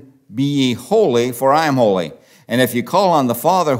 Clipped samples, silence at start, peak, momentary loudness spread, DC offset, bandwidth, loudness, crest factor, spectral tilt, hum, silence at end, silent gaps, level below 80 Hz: under 0.1%; 0.3 s; 0 dBFS; 8 LU; under 0.1%; 16.5 kHz; -16 LUFS; 16 dB; -5.5 dB/octave; none; 0 s; none; -64 dBFS